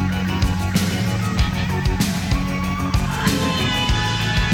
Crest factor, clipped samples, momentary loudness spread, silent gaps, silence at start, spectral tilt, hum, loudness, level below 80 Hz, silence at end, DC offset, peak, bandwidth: 12 dB; under 0.1%; 3 LU; none; 0 s; -5 dB/octave; none; -20 LUFS; -28 dBFS; 0 s; under 0.1%; -8 dBFS; 18 kHz